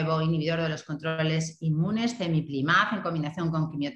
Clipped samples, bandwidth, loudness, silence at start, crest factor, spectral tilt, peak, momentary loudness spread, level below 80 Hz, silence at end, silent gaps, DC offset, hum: under 0.1%; 8.6 kHz; -27 LUFS; 0 s; 18 dB; -6 dB/octave; -8 dBFS; 7 LU; -60 dBFS; 0 s; none; under 0.1%; none